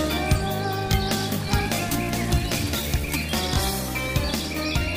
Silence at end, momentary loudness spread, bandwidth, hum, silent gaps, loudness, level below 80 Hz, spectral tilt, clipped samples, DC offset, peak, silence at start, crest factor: 0 s; 3 LU; 16 kHz; none; none; -24 LUFS; -32 dBFS; -4.5 dB/octave; under 0.1%; under 0.1%; -6 dBFS; 0 s; 18 dB